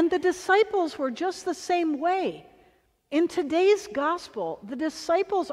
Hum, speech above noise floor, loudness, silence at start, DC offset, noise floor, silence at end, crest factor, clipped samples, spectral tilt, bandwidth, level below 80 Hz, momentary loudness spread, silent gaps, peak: none; 37 dB; -26 LUFS; 0 s; under 0.1%; -62 dBFS; 0 s; 16 dB; under 0.1%; -3.5 dB/octave; 13 kHz; -66 dBFS; 10 LU; none; -10 dBFS